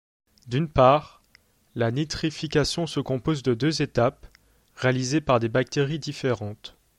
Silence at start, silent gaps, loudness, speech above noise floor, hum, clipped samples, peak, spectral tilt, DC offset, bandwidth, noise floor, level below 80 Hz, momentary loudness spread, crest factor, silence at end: 0.45 s; none; -24 LUFS; 37 dB; none; under 0.1%; -4 dBFS; -5.5 dB/octave; under 0.1%; 12 kHz; -61 dBFS; -48 dBFS; 9 LU; 22 dB; 0.3 s